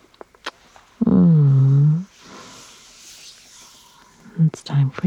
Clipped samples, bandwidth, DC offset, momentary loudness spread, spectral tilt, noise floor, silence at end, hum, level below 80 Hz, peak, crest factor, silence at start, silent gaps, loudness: under 0.1%; 8.4 kHz; under 0.1%; 26 LU; -8.5 dB/octave; -51 dBFS; 0 s; none; -54 dBFS; -6 dBFS; 14 dB; 0.45 s; none; -17 LUFS